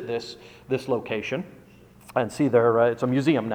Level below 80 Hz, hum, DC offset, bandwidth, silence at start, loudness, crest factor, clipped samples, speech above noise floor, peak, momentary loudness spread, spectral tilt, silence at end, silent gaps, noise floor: -62 dBFS; none; under 0.1%; 15.5 kHz; 0 s; -24 LUFS; 18 dB; under 0.1%; 26 dB; -6 dBFS; 14 LU; -7 dB/octave; 0 s; none; -50 dBFS